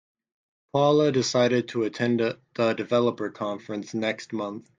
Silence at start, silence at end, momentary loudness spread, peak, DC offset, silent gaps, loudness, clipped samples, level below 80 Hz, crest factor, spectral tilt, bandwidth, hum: 0.75 s; 0.2 s; 11 LU; -8 dBFS; under 0.1%; none; -25 LUFS; under 0.1%; -70 dBFS; 18 dB; -5.5 dB/octave; 9.4 kHz; none